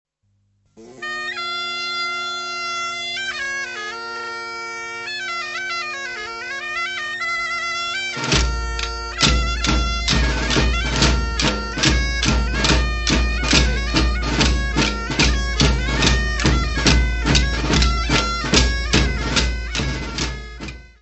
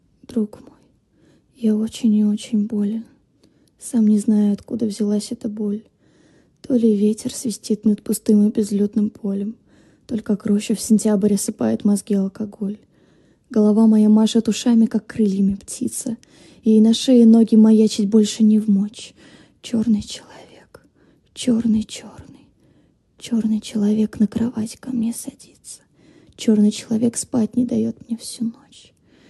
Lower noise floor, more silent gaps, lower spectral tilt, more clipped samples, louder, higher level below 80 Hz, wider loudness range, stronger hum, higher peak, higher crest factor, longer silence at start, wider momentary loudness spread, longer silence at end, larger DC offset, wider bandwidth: first, -65 dBFS vs -57 dBFS; neither; second, -3.5 dB/octave vs -6 dB/octave; neither; about the same, -20 LUFS vs -19 LUFS; first, -24 dBFS vs -56 dBFS; about the same, 7 LU vs 8 LU; first, 50 Hz at -55 dBFS vs none; first, 0 dBFS vs -4 dBFS; about the same, 20 dB vs 16 dB; first, 0.75 s vs 0.3 s; second, 10 LU vs 15 LU; second, 0.15 s vs 0.8 s; neither; second, 8.4 kHz vs 12.5 kHz